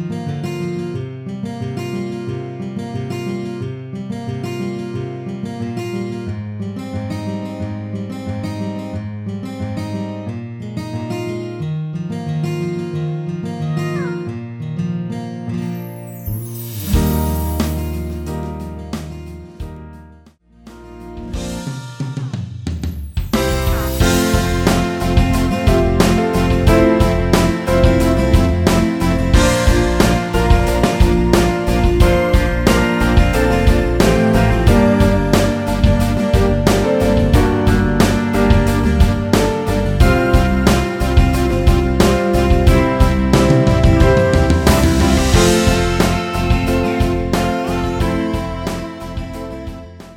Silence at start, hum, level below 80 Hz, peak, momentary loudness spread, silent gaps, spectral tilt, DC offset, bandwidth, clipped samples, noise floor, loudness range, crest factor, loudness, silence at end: 0 s; none; -22 dBFS; 0 dBFS; 14 LU; none; -6 dB/octave; under 0.1%; 19 kHz; under 0.1%; -46 dBFS; 12 LU; 16 dB; -16 LUFS; 0 s